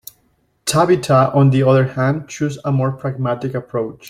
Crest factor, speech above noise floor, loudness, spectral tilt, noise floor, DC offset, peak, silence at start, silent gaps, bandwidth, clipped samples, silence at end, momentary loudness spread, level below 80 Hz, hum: 16 dB; 45 dB; -17 LUFS; -6.5 dB/octave; -61 dBFS; under 0.1%; -2 dBFS; 0.65 s; none; 15.5 kHz; under 0.1%; 0 s; 10 LU; -52 dBFS; none